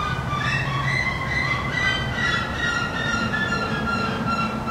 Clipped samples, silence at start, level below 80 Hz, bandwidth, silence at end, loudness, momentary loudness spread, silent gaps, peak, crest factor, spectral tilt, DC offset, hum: under 0.1%; 0 s; -38 dBFS; 15.5 kHz; 0 s; -23 LUFS; 2 LU; none; -8 dBFS; 14 dB; -5 dB/octave; under 0.1%; none